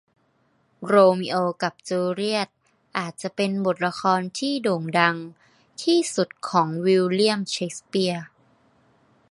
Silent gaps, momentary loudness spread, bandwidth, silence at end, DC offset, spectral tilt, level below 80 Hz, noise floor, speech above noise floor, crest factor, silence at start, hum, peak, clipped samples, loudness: none; 12 LU; 11.5 kHz; 1.05 s; under 0.1%; -5 dB/octave; -72 dBFS; -66 dBFS; 43 dB; 22 dB; 0.8 s; none; -2 dBFS; under 0.1%; -23 LUFS